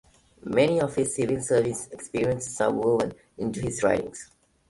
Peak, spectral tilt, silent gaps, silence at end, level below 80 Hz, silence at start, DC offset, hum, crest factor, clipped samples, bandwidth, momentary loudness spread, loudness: -8 dBFS; -5 dB/octave; none; 0.45 s; -54 dBFS; 0.45 s; under 0.1%; none; 18 dB; under 0.1%; 11.5 kHz; 11 LU; -26 LUFS